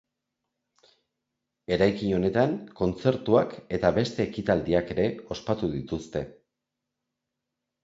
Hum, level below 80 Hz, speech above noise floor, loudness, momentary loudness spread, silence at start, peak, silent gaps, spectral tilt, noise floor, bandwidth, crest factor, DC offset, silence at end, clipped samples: none; -50 dBFS; 59 dB; -27 LUFS; 10 LU; 1.7 s; -6 dBFS; none; -7 dB/octave; -85 dBFS; 7.8 kHz; 22 dB; under 0.1%; 1.5 s; under 0.1%